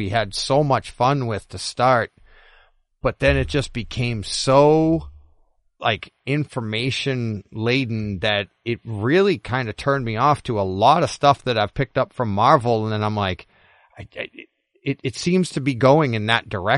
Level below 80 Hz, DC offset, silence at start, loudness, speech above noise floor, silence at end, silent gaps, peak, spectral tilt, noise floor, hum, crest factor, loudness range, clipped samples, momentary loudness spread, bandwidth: -42 dBFS; under 0.1%; 0 s; -20 LUFS; 39 dB; 0 s; none; 0 dBFS; -5.5 dB/octave; -59 dBFS; none; 20 dB; 4 LU; under 0.1%; 11 LU; 11.5 kHz